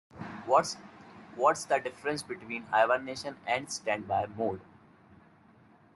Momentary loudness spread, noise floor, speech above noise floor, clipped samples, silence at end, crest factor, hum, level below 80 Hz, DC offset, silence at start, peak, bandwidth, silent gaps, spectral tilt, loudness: 17 LU; -60 dBFS; 29 dB; under 0.1%; 1.3 s; 22 dB; none; -74 dBFS; under 0.1%; 0.15 s; -10 dBFS; 12 kHz; none; -3.5 dB/octave; -31 LUFS